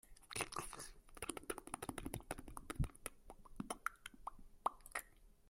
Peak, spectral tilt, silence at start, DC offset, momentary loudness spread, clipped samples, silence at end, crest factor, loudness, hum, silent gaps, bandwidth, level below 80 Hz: -22 dBFS; -3.5 dB/octave; 0.05 s; under 0.1%; 10 LU; under 0.1%; 0 s; 26 dB; -48 LUFS; none; none; 16.5 kHz; -56 dBFS